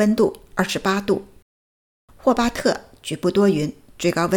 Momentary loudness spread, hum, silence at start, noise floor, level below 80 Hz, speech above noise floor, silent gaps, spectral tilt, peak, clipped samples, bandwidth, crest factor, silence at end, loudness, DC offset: 7 LU; none; 0 s; under -90 dBFS; -48 dBFS; over 70 dB; 1.42-2.08 s; -5.5 dB/octave; -4 dBFS; under 0.1%; 19 kHz; 18 dB; 0 s; -21 LUFS; under 0.1%